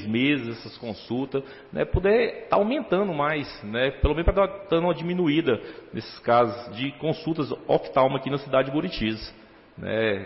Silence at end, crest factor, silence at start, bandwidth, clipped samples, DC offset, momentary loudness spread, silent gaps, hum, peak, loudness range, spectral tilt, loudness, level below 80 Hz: 0 s; 16 dB; 0 s; 5.8 kHz; under 0.1%; under 0.1%; 14 LU; none; none; -8 dBFS; 2 LU; -10 dB/octave; -25 LUFS; -38 dBFS